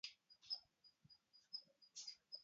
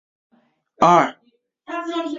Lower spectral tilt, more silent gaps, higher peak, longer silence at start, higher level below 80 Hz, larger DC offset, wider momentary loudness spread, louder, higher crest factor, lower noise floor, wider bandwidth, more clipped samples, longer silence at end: second, 2 dB/octave vs -5.5 dB/octave; neither; second, -36 dBFS vs -2 dBFS; second, 0.05 s vs 0.8 s; second, under -90 dBFS vs -62 dBFS; neither; first, 18 LU vs 15 LU; second, -53 LUFS vs -18 LUFS; about the same, 22 dB vs 20 dB; first, -74 dBFS vs -59 dBFS; about the same, 7.6 kHz vs 7.6 kHz; neither; about the same, 0 s vs 0 s